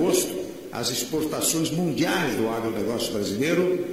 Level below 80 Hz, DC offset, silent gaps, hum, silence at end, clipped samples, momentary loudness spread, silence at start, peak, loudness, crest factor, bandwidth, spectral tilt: -56 dBFS; 0.2%; none; none; 0 s; under 0.1%; 5 LU; 0 s; -8 dBFS; -25 LUFS; 16 dB; 16 kHz; -4 dB/octave